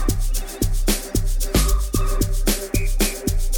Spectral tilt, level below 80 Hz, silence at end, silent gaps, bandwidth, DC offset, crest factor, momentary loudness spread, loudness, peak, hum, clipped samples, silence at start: -4 dB/octave; -20 dBFS; 0 s; none; 19 kHz; under 0.1%; 16 dB; 5 LU; -23 LUFS; -4 dBFS; none; under 0.1%; 0 s